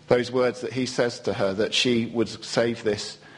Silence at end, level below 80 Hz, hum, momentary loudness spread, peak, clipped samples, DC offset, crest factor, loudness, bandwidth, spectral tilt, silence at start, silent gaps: 0 s; -60 dBFS; none; 6 LU; -4 dBFS; under 0.1%; under 0.1%; 20 dB; -25 LUFS; 10.5 kHz; -4.5 dB/octave; 0.1 s; none